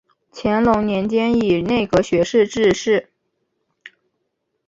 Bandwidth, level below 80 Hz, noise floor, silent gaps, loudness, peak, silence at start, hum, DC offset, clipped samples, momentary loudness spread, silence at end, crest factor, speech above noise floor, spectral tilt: 7.8 kHz; -46 dBFS; -73 dBFS; none; -18 LUFS; -2 dBFS; 0.35 s; none; under 0.1%; under 0.1%; 4 LU; 1.65 s; 16 dB; 56 dB; -5.5 dB/octave